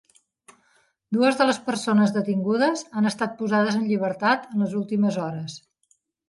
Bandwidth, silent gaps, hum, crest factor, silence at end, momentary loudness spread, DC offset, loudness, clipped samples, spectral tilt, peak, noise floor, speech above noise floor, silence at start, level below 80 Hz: 11.5 kHz; none; none; 16 dB; 0.7 s; 8 LU; under 0.1%; -23 LUFS; under 0.1%; -5.5 dB/octave; -8 dBFS; -67 dBFS; 45 dB; 1.1 s; -70 dBFS